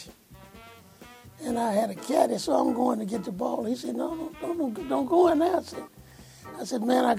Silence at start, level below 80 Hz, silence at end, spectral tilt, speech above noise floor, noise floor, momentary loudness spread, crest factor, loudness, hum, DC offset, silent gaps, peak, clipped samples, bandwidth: 0 s; -62 dBFS; 0 s; -5 dB/octave; 24 dB; -50 dBFS; 19 LU; 20 dB; -27 LUFS; none; under 0.1%; none; -8 dBFS; under 0.1%; 16 kHz